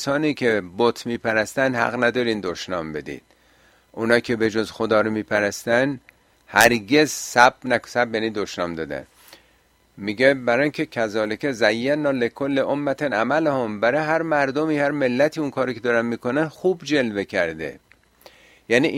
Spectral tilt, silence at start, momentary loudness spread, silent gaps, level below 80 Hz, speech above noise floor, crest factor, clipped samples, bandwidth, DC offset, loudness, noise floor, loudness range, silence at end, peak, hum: -4.5 dB/octave; 0 s; 10 LU; none; -58 dBFS; 39 dB; 22 dB; under 0.1%; 16 kHz; under 0.1%; -21 LUFS; -60 dBFS; 4 LU; 0 s; 0 dBFS; none